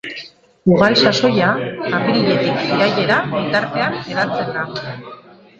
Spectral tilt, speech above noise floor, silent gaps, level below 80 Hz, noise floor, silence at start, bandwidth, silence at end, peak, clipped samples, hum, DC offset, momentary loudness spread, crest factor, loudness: -5.5 dB/octave; 21 dB; none; -54 dBFS; -38 dBFS; 0.05 s; 8 kHz; 0.45 s; 0 dBFS; under 0.1%; none; under 0.1%; 15 LU; 18 dB; -16 LUFS